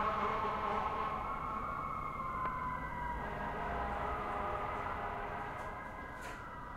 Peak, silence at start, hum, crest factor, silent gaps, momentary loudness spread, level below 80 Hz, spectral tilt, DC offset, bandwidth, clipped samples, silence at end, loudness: -24 dBFS; 0 s; none; 16 dB; none; 9 LU; -50 dBFS; -6 dB/octave; under 0.1%; 16 kHz; under 0.1%; 0 s; -39 LUFS